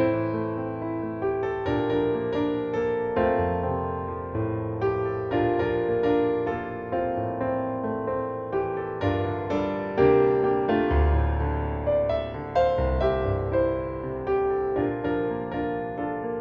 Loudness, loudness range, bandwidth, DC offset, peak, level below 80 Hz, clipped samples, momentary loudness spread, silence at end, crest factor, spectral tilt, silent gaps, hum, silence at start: -26 LUFS; 3 LU; 6.6 kHz; under 0.1%; -8 dBFS; -36 dBFS; under 0.1%; 7 LU; 0 s; 16 dB; -9.5 dB/octave; none; none; 0 s